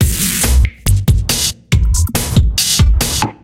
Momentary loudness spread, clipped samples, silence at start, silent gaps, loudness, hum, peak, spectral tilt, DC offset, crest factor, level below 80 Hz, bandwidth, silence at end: 4 LU; under 0.1%; 0 s; none; -13 LUFS; none; 0 dBFS; -3.5 dB/octave; under 0.1%; 12 dB; -16 dBFS; 17 kHz; 0.1 s